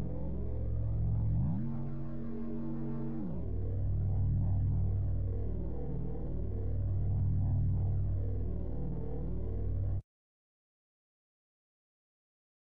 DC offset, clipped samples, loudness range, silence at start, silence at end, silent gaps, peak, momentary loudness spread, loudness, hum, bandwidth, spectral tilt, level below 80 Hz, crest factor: 1%; under 0.1%; 6 LU; 0 s; 2.6 s; none; -22 dBFS; 7 LU; -36 LUFS; none; 2.2 kHz; -13 dB/octave; -40 dBFS; 10 dB